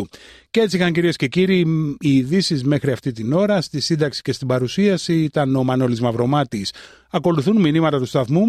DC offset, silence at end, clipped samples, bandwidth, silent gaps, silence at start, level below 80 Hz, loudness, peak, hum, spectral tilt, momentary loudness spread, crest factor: under 0.1%; 0 s; under 0.1%; 13.5 kHz; none; 0 s; -54 dBFS; -19 LUFS; -6 dBFS; none; -6.5 dB/octave; 6 LU; 12 dB